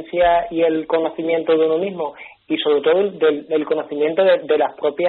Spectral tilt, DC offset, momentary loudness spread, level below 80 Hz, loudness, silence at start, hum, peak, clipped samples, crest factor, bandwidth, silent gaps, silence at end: -3 dB/octave; under 0.1%; 6 LU; -52 dBFS; -18 LUFS; 0 s; none; -4 dBFS; under 0.1%; 14 dB; 4.3 kHz; none; 0 s